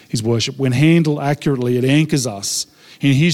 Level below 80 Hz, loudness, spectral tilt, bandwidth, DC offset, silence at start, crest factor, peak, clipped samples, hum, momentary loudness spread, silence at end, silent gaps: -52 dBFS; -17 LUFS; -5.5 dB/octave; 15.5 kHz; under 0.1%; 0.15 s; 12 dB; -4 dBFS; under 0.1%; none; 7 LU; 0 s; none